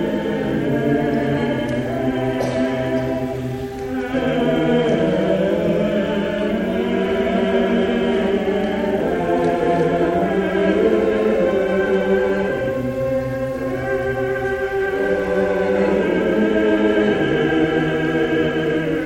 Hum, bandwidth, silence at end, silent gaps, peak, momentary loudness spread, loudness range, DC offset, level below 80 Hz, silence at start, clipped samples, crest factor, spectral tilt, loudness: none; 16.5 kHz; 0 s; none; -4 dBFS; 5 LU; 3 LU; under 0.1%; -42 dBFS; 0 s; under 0.1%; 14 dB; -7 dB/octave; -19 LUFS